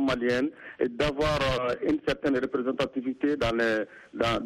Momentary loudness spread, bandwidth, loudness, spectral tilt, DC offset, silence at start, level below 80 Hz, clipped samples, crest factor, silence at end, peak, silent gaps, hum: 5 LU; 13.5 kHz; -28 LUFS; -5.5 dB/octave; under 0.1%; 0 s; -46 dBFS; under 0.1%; 16 dB; 0 s; -12 dBFS; none; none